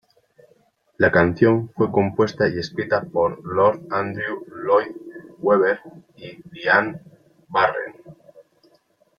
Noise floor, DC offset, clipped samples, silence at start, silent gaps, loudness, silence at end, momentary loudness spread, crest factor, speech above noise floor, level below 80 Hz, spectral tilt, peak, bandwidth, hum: -61 dBFS; under 0.1%; under 0.1%; 1 s; none; -21 LUFS; 1.05 s; 19 LU; 20 dB; 41 dB; -58 dBFS; -7.5 dB/octave; -2 dBFS; 7 kHz; none